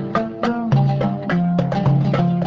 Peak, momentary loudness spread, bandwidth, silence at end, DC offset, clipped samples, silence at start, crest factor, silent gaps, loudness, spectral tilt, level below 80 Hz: -4 dBFS; 5 LU; 6.8 kHz; 0 s; under 0.1%; under 0.1%; 0 s; 14 dB; none; -19 LUFS; -9 dB/octave; -44 dBFS